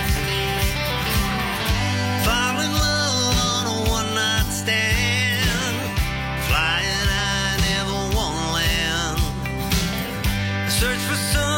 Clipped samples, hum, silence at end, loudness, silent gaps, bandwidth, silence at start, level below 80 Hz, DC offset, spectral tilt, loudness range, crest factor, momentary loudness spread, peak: under 0.1%; none; 0 s; -21 LUFS; none; 16.5 kHz; 0 s; -30 dBFS; under 0.1%; -3.5 dB/octave; 2 LU; 14 dB; 5 LU; -6 dBFS